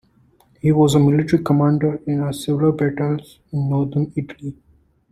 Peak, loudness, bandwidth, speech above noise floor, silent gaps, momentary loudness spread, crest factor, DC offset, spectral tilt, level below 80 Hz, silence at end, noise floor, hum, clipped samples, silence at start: -2 dBFS; -19 LUFS; 13.5 kHz; 38 dB; none; 13 LU; 16 dB; under 0.1%; -7.5 dB/octave; -50 dBFS; 0.6 s; -56 dBFS; none; under 0.1%; 0.65 s